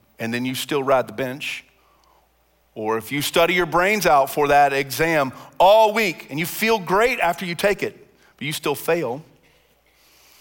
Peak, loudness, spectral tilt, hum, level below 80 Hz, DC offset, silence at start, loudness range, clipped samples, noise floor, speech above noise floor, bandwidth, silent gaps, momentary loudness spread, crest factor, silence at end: -4 dBFS; -20 LUFS; -4 dB/octave; none; -52 dBFS; under 0.1%; 0.2 s; 7 LU; under 0.1%; -62 dBFS; 42 dB; 17 kHz; none; 12 LU; 16 dB; 1.2 s